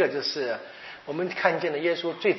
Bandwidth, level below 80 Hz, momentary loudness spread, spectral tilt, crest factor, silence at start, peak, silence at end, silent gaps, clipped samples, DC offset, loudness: 6 kHz; -76 dBFS; 11 LU; -2 dB/octave; 20 dB; 0 s; -6 dBFS; 0 s; none; under 0.1%; under 0.1%; -27 LUFS